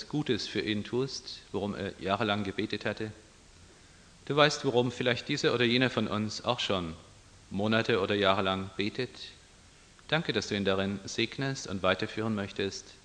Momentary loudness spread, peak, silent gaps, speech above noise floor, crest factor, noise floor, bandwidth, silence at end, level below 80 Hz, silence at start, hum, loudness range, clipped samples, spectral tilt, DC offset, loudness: 11 LU; -6 dBFS; none; 26 dB; 24 dB; -57 dBFS; 10 kHz; 0.1 s; -62 dBFS; 0 s; none; 5 LU; under 0.1%; -5 dB/octave; under 0.1%; -30 LUFS